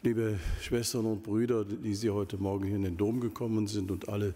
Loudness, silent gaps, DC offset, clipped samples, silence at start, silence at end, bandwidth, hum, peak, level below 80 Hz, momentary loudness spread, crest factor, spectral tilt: -32 LUFS; none; under 0.1%; under 0.1%; 0.05 s; 0 s; 16 kHz; none; -16 dBFS; -46 dBFS; 3 LU; 14 dB; -6 dB/octave